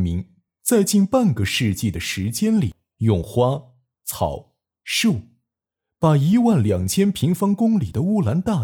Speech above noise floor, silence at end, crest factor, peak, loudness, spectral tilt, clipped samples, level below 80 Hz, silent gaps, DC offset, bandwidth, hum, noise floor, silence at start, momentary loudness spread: 66 dB; 0 s; 14 dB; -6 dBFS; -20 LUFS; -5.5 dB/octave; under 0.1%; -44 dBFS; none; under 0.1%; 19.5 kHz; none; -85 dBFS; 0 s; 10 LU